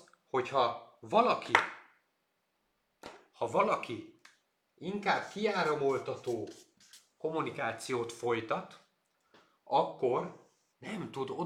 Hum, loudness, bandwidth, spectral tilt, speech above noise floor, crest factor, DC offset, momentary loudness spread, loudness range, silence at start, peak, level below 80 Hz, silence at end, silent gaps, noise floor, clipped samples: none; -33 LUFS; 15 kHz; -5 dB/octave; 47 dB; 28 dB; under 0.1%; 17 LU; 5 LU; 0.35 s; -6 dBFS; -78 dBFS; 0 s; none; -79 dBFS; under 0.1%